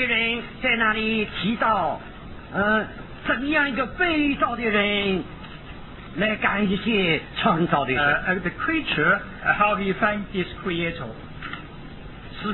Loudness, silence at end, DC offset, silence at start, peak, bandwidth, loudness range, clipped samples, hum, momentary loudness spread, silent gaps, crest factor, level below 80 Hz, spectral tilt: -22 LUFS; 0 s; under 0.1%; 0 s; -6 dBFS; 4.2 kHz; 2 LU; under 0.1%; none; 17 LU; none; 18 dB; -44 dBFS; -8.5 dB/octave